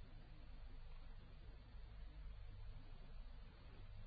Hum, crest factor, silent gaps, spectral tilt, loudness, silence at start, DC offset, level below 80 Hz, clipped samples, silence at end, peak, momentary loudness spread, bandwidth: none; 10 dB; none; -5.5 dB/octave; -61 LUFS; 0 s; under 0.1%; -56 dBFS; under 0.1%; 0 s; -44 dBFS; 3 LU; 4.8 kHz